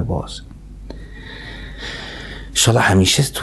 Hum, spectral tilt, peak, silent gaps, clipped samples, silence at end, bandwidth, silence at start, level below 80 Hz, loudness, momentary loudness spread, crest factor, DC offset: none; -3.5 dB/octave; -2 dBFS; none; under 0.1%; 0 s; 12.5 kHz; 0 s; -34 dBFS; -16 LUFS; 23 LU; 18 dB; under 0.1%